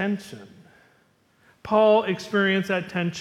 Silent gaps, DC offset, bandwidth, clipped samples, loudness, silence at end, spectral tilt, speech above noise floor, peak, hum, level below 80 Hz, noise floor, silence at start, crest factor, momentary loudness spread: none; under 0.1%; 13.5 kHz; under 0.1%; -22 LUFS; 0 s; -6 dB/octave; 40 dB; -6 dBFS; none; -64 dBFS; -62 dBFS; 0 s; 18 dB; 24 LU